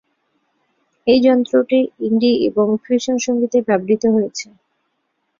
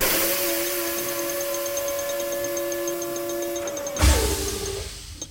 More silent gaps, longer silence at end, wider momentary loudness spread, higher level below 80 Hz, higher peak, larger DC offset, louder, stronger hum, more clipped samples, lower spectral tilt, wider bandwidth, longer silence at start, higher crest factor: neither; first, 0.95 s vs 0 s; about the same, 7 LU vs 9 LU; second, -60 dBFS vs -32 dBFS; first, -2 dBFS vs -6 dBFS; neither; first, -16 LUFS vs -25 LUFS; neither; neither; first, -5 dB/octave vs -3 dB/octave; second, 7.4 kHz vs over 20 kHz; first, 1.05 s vs 0 s; about the same, 16 dB vs 18 dB